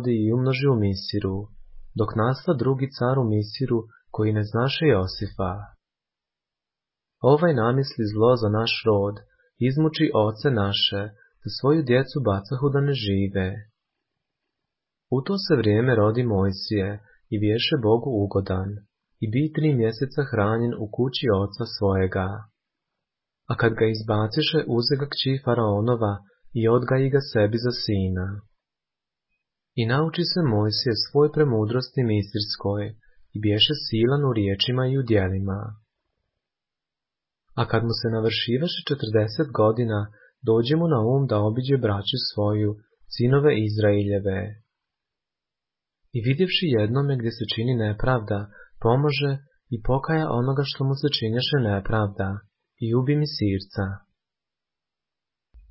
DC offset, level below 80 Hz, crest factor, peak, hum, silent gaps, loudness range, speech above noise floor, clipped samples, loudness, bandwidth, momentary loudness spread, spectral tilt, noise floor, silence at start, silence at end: under 0.1%; -46 dBFS; 18 dB; -6 dBFS; none; none; 4 LU; 66 dB; under 0.1%; -23 LUFS; 5.8 kHz; 10 LU; -10.5 dB/octave; -89 dBFS; 0 s; 0.1 s